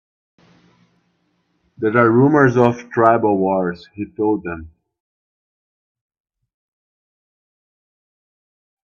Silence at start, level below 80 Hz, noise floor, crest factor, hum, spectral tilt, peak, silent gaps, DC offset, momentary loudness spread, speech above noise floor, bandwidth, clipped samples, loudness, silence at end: 1.8 s; -56 dBFS; -66 dBFS; 20 dB; 60 Hz at -45 dBFS; -8.5 dB/octave; 0 dBFS; none; under 0.1%; 17 LU; 50 dB; 7 kHz; under 0.1%; -16 LUFS; 4.35 s